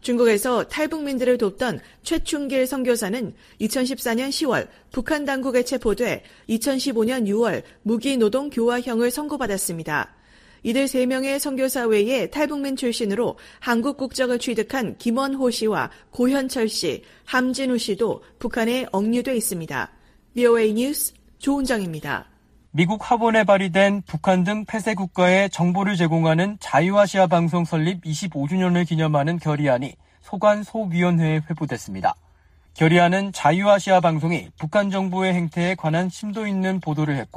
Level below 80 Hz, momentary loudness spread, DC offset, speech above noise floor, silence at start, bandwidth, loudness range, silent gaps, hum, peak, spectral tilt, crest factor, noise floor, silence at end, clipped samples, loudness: -50 dBFS; 9 LU; under 0.1%; 33 dB; 0.05 s; 15.5 kHz; 4 LU; none; none; -4 dBFS; -5.5 dB/octave; 18 dB; -54 dBFS; 0 s; under 0.1%; -22 LUFS